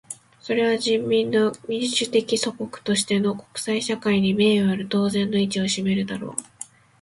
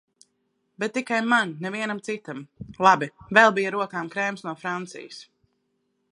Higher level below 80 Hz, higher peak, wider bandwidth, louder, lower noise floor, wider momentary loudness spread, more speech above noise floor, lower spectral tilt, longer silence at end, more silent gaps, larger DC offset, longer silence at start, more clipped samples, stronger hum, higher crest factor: first, -60 dBFS vs -66 dBFS; second, -6 dBFS vs 0 dBFS; about the same, 11.5 kHz vs 11.5 kHz; about the same, -22 LUFS vs -23 LUFS; second, -43 dBFS vs -73 dBFS; second, 12 LU vs 20 LU; second, 21 dB vs 49 dB; about the same, -4.5 dB/octave vs -4.5 dB/octave; second, 0.4 s vs 0.9 s; neither; neither; second, 0.1 s vs 0.8 s; neither; neither; second, 16 dB vs 24 dB